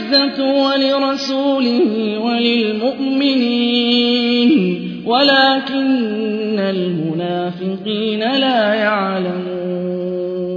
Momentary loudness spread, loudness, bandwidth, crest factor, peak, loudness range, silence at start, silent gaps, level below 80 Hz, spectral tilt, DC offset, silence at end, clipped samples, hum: 8 LU; -16 LUFS; 5.4 kHz; 16 dB; 0 dBFS; 4 LU; 0 s; none; -62 dBFS; -6 dB/octave; under 0.1%; 0 s; under 0.1%; none